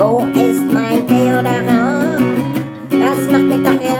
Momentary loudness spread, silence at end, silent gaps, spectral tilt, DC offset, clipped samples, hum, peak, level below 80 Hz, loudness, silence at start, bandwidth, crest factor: 4 LU; 0 s; none; -6.5 dB/octave; under 0.1%; under 0.1%; none; 0 dBFS; -52 dBFS; -14 LUFS; 0 s; 19 kHz; 12 dB